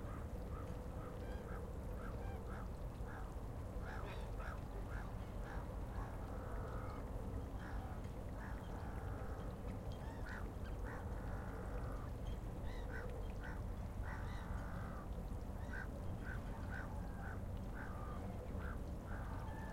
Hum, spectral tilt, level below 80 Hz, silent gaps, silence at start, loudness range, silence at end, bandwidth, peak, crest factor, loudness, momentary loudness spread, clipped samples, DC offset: none; -7 dB/octave; -48 dBFS; none; 0 s; 1 LU; 0 s; 16.5 kHz; -34 dBFS; 12 dB; -48 LUFS; 2 LU; under 0.1%; under 0.1%